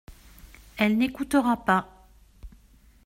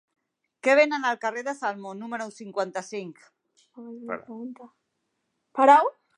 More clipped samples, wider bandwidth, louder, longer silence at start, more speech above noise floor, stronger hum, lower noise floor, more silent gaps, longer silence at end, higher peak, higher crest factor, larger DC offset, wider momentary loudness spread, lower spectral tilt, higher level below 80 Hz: neither; first, 16 kHz vs 10.5 kHz; about the same, -24 LUFS vs -24 LUFS; second, 0.1 s vs 0.65 s; second, 32 dB vs 53 dB; neither; second, -56 dBFS vs -78 dBFS; neither; first, 0.6 s vs 0.25 s; second, -8 dBFS vs -4 dBFS; about the same, 20 dB vs 22 dB; neither; second, 3 LU vs 22 LU; first, -5.5 dB/octave vs -4 dB/octave; first, -52 dBFS vs -84 dBFS